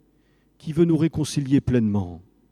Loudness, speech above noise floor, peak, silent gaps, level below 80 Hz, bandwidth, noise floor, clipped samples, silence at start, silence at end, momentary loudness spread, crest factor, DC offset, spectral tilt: -22 LUFS; 41 dB; -6 dBFS; none; -48 dBFS; 13.5 kHz; -62 dBFS; under 0.1%; 0.65 s; 0.3 s; 12 LU; 16 dB; under 0.1%; -7 dB/octave